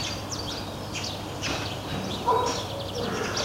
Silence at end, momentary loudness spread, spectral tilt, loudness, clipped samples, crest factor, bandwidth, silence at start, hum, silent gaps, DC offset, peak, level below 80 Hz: 0 s; 7 LU; -3.5 dB/octave; -29 LUFS; under 0.1%; 18 dB; 16 kHz; 0 s; none; none; under 0.1%; -12 dBFS; -48 dBFS